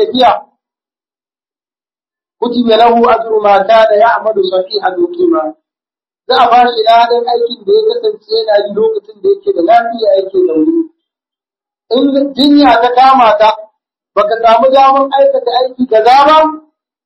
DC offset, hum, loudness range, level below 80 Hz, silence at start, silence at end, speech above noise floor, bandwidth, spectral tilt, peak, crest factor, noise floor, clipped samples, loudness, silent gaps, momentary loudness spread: under 0.1%; none; 4 LU; -50 dBFS; 0 s; 0.45 s; over 82 dB; 8.6 kHz; -5 dB/octave; 0 dBFS; 10 dB; under -90 dBFS; 0.4%; -9 LUFS; none; 9 LU